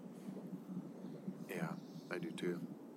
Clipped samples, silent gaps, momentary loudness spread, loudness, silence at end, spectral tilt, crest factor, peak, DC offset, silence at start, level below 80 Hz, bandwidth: under 0.1%; none; 7 LU; -46 LUFS; 0 s; -6.5 dB/octave; 20 dB; -26 dBFS; under 0.1%; 0 s; under -90 dBFS; 16 kHz